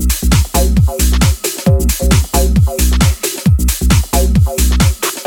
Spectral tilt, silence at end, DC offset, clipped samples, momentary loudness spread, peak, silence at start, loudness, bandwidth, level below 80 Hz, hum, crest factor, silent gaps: -5 dB/octave; 0 s; under 0.1%; under 0.1%; 2 LU; 0 dBFS; 0 s; -13 LUFS; 18.5 kHz; -14 dBFS; none; 12 dB; none